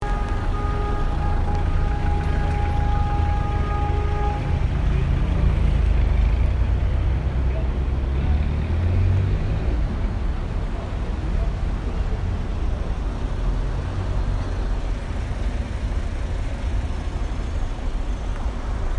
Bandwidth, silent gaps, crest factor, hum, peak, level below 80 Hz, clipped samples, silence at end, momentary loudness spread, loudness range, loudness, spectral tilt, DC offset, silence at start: 9.2 kHz; none; 14 dB; none; -8 dBFS; -22 dBFS; under 0.1%; 0 s; 7 LU; 6 LU; -25 LUFS; -7.5 dB/octave; under 0.1%; 0 s